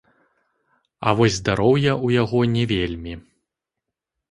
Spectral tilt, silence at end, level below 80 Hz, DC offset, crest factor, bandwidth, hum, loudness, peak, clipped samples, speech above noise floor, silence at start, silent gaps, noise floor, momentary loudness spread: -6 dB/octave; 1.1 s; -44 dBFS; under 0.1%; 20 dB; 11.5 kHz; none; -20 LUFS; -2 dBFS; under 0.1%; 64 dB; 1 s; none; -84 dBFS; 13 LU